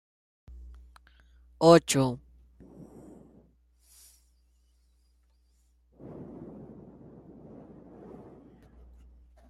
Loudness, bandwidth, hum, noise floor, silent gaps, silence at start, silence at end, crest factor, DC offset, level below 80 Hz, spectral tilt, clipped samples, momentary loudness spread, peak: -23 LUFS; 14.5 kHz; none; -66 dBFS; none; 1.6 s; 3.05 s; 26 dB; under 0.1%; -58 dBFS; -5 dB/octave; under 0.1%; 32 LU; -6 dBFS